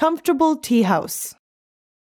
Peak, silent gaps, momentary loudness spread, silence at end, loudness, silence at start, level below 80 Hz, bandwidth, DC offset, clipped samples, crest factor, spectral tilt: -6 dBFS; none; 10 LU; 0.85 s; -19 LUFS; 0 s; -62 dBFS; 18.5 kHz; under 0.1%; under 0.1%; 16 dB; -5 dB/octave